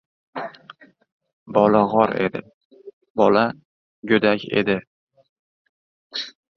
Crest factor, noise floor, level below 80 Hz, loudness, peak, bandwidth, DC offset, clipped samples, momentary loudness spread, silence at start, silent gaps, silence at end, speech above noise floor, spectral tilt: 22 dB; -48 dBFS; -60 dBFS; -20 LUFS; -2 dBFS; 6.6 kHz; under 0.1%; under 0.1%; 18 LU; 0.35 s; 1.12-1.20 s, 1.33-1.46 s, 2.54-2.70 s, 2.93-3.01 s, 3.10-3.15 s, 3.65-4.03 s, 4.87-5.07 s, 5.29-6.10 s; 0.25 s; 29 dB; -7 dB/octave